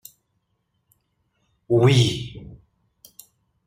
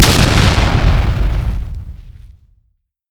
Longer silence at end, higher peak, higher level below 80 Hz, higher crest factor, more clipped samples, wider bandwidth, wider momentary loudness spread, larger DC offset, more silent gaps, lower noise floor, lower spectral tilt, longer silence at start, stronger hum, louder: first, 1.1 s vs 0.85 s; second, -6 dBFS vs 0 dBFS; second, -52 dBFS vs -18 dBFS; first, 20 dB vs 14 dB; neither; second, 15 kHz vs over 20 kHz; first, 21 LU vs 18 LU; neither; neither; first, -73 dBFS vs -62 dBFS; first, -6 dB/octave vs -4.5 dB/octave; first, 1.7 s vs 0 s; neither; second, -19 LUFS vs -14 LUFS